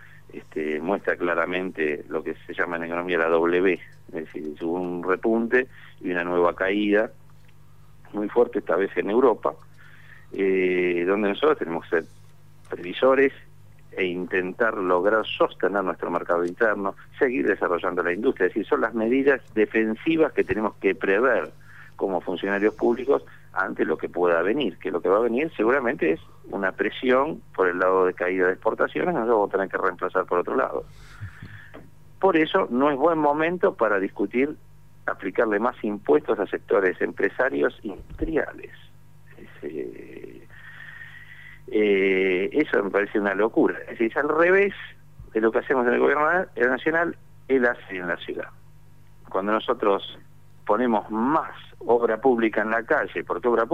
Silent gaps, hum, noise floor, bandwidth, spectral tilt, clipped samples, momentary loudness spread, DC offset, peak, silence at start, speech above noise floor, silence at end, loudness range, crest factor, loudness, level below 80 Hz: none; 50 Hz at -55 dBFS; -53 dBFS; 7.6 kHz; -7 dB/octave; under 0.1%; 15 LU; 0.4%; -8 dBFS; 0.35 s; 29 dB; 0 s; 4 LU; 16 dB; -23 LUFS; -54 dBFS